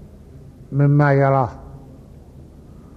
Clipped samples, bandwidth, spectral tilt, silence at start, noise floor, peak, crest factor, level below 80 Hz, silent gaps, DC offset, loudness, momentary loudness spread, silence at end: under 0.1%; 4.8 kHz; -10.5 dB/octave; 0.35 s; -42 dBFS; -4 dBFS; 16 dB; -46 dBFS; none; under 0.1%; -17 LUFS; 22 LU; 1.2 s